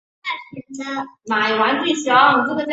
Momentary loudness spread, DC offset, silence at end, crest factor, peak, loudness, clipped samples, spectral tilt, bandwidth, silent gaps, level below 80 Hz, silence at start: 16 LU; under 0.1%; 0 s; 18 dB; -2 dBFS; -18 LUFS; under 0.1%; -3 dB/octave; 8 kHz; none; -66 dBFS; 0.25 s